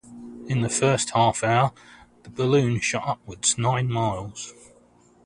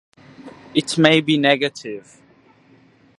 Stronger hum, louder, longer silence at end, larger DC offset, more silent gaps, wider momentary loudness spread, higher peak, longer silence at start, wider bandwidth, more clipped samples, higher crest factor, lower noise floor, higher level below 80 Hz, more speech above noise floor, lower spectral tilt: neither; second, -23 LUFS vs -17 LUFS; second, 0.75 s vs 1.2 s; neither; neither; about the same, 16 LU vs 18 LU; second, -6 dBFS vs 0 dBFS; second, 0.05 s vs 0.45 s; about the same, 11 kHz vs 11.5 kHz; neither; about the same, 18 dB vs 22 dB; about the same, -56 dBFS vs -53 dBFS; first, -54 dBFS vs -64 dBFS; about the same, 33 dB vs 35 dB; about the same, -4.5 dB/octave vs -4.5 dB/octave